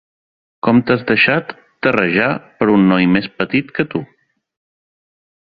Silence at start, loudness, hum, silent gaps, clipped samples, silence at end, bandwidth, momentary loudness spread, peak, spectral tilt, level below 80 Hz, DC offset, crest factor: 0.65 s; -15 LUFS; none; none; under 0.1%; 1.35 s; 5.2 kHz; 9 LU; 0 dBFS; -9 dB/octave; -54 dBFS; under 0.1%; 16 dB